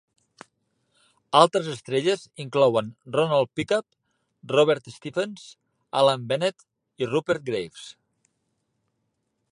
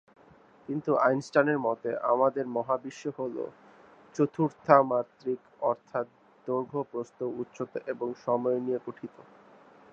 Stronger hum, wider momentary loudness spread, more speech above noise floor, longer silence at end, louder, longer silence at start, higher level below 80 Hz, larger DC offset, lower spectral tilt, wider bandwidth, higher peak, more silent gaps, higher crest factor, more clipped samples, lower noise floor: neither; about the same, 11 LU vs 13 LU; first, 53 dB vs 29 dB; first, 1.6 s vs 0.7 s; first, -24 LUFS vs -29 LUFS; first, 1.3 s vs 0.7 s; first, -68 dBFS vs -78 dBFS; neither; second, -5 dB/octave vs -7.5 dB/octave; first, 11 kHz vs 8.2 kHz; about the same, -2 dBFS vs -4 dBFS; neither; about the same, 24 dB vs 26 dB; neither; first, -76 dBFS vs -58 dBFS